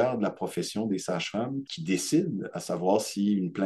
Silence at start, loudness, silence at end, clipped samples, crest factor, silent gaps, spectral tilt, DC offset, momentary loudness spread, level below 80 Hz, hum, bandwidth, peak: 0 s; -29 LUFS; 0 s; under 0.1%; 18 dB; none; -5 dB/octave; under 0.1%; 7 LU; -72 dBFS; none; 12.5 kHz; -10 dBFS